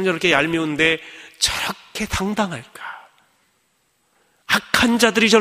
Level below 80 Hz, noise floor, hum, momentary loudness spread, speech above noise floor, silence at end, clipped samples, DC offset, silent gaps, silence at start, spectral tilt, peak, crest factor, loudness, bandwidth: -44 dBFS; -65 dBFS; none; 19 LU; 46 dB; 0 s; under 0.1%; under 0.1%; none; 0 s; -3 dB/octave; 0 dBFS; 20 dB; -19 LUFS; 15.5 kHz